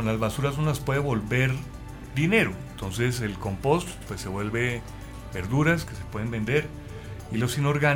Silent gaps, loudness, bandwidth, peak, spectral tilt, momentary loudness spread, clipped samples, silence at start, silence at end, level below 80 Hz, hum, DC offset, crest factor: none; -27 LUFS; 18 kHz; -8 dBFS; -6 dB/octave; 14 LU; under 0.1%; 0 s; 0 s; -44 dBFS; none; under 0.1%; 18 dB